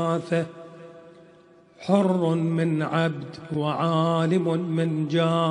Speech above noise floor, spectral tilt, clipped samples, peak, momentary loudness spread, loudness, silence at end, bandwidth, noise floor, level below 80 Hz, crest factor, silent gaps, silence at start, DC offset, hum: 30 dB; -7.5 dB/octave; under 0.1%; -6 dBFS; 14 LU; -24 LUFS; 0 s; 10 kHz; -53 dBFS; -68 dBFS; 18 dB; none; 0 s; under 0.1%; none